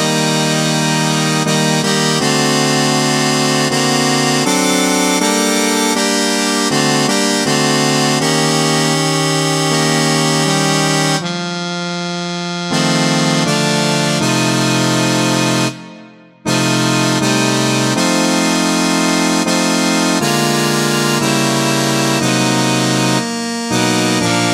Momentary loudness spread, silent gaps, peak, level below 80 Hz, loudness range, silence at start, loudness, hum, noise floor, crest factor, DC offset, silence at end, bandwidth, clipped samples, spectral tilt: 3 LU; none; 0 dBFS; -56 dBFS; 2 LU; 0 s; -13 LUFS; none; -39 dBFS; 14 dB; under 0.1%; 0 s; 17 kHz; under 0.1%; -3.5 dB/octave